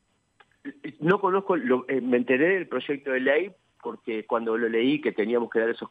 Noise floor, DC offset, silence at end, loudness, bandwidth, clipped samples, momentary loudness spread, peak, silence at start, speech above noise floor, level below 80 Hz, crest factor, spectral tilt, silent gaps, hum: -63 dBFS; under 0.1%; 0.05 s; -25 LUFS; 4.7 kHz; under 0.1%; 16 LU; -8 dBFS; 0.65 s; 38 dB; -78 dBFS; 18 dB; -8 dB/octave; none; none